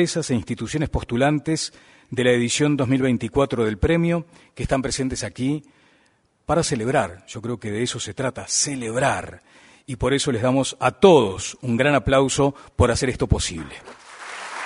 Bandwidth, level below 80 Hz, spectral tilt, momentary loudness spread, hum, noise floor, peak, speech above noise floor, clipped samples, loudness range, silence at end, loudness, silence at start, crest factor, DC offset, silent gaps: 11 kHz; -38 dBFS; -4.5 dB/octave; 14 LU; none; -62 dBFS; 0 dBFS; 41 dB; under 0.1%; 6 LU; 0 s; -21 LUFS; 0 s; 22 dB; under 0.1%; none